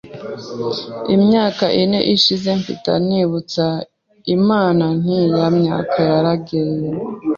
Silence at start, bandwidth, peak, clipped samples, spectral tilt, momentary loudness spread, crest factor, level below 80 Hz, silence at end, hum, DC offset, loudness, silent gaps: 0.05 s; 7.4 kHz; 0 dBFS; under 0.1%; -6.5 dB/octave; 11 LU; 16 dB; -54 dBFS; 0 s; none; under 0.1%; -17 LUFS; none